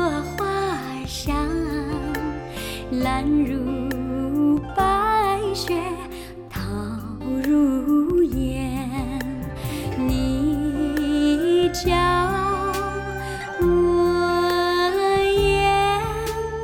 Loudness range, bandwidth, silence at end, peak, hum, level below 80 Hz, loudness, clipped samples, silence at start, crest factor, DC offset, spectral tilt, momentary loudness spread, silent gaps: 5 LU; 17.5 kHz; 0 s; -8 dBFS; none; -36 dBFS; -22 LUFS; under 0.1%; 0 s; 14 dB; under 0.1%; -5.5 dB/octave; 11 LU; none